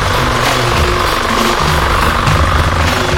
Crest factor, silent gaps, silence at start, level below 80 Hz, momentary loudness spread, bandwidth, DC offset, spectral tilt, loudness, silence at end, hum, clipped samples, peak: 12 dB; none; 0 s; -20 dBFS; 1 LU; 17 kHz; under 0.1%; -4.5 dB/octave; -12 LUFS; 0 s; none; under 0.1%; 0 dBFS